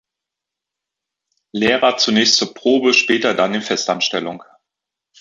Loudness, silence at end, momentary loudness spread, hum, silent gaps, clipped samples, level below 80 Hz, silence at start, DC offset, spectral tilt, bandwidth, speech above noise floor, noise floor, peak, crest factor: -15 LUFS; 0.75 s; 11 LU; none; none; under 0.1%; -62 dBFS; 1.55 s; under 0.1%; -2.5 dB/octave; 8 kHz; 68 dB; -84 dBFS; 0 dBFS; 18 dB